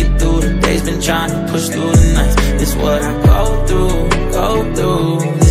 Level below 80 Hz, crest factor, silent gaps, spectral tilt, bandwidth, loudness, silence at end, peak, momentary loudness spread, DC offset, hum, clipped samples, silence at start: -16 dBFS; 12 dB; none; -5.5 dB/octave; 16 kHz; -14 LUFS; 0 s; 0 dBFS; 4 LU; under 0.1%; none; 0.1%; 0 s